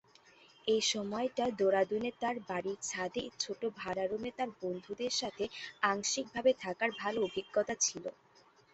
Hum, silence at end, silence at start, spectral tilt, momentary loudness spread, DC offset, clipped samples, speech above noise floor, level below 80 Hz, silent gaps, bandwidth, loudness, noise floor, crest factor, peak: none; 0.65 s; 0.65 s; -2.5 dB/octave; 8 LU; under 0.1%; under 0.1%; 30 dB; -72 dBFS; none; 8.2 kHz; -35 LUFS; -65 dBFS; 22 dB; -14 dBFS